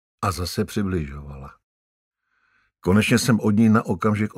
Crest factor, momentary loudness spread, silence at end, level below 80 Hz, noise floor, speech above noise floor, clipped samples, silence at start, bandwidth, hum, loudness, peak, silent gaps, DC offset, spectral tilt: 18 dB; 17 LU; 0.1 s; -44 dBFS; -66 dBFS; 46 dB; under 0.1%; 0.2 s; 16 kHz; none; -21 LUFS; -6 dBFS; 1.64-2.11 s; under 0.1%; -6 dB/octave